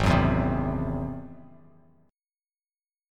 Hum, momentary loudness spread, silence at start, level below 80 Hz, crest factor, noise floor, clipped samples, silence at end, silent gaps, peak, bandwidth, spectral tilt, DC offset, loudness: none; 17 LU; 0 s; -38 dBFS; 20 dB; under -90 dBFS; under 0.1%; 1.65 s; none; -10 dBFS; 12 kHz; -7.5 dB/octave; under 0.1%; -27 LUFS